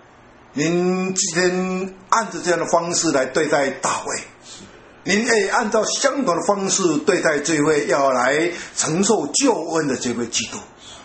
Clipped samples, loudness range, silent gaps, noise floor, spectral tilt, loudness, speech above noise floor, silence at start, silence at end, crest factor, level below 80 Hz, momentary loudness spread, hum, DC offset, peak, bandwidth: under 0.1%; 2 LU; none; -47 dBFS; -3.5 dB/octave; -19 LUFS; 28 dB; 0.55 s; 0 s; 20 dB; -58 dBFS; 10 LU; none; under 0.1%; 0 dBFS; 8.8 kHz